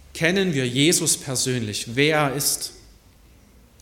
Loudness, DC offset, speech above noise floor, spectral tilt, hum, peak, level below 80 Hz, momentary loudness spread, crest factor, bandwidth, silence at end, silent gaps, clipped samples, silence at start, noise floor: -21 LUFS; under 0.1%; 30 dB; -3 dB/octave; none; -4 dBFS; -52 dBFS; 8 LU; 20 dB; 17.5 kHz; 1.05 s; none; under 0.1%; 0.15 s; -52 dBFS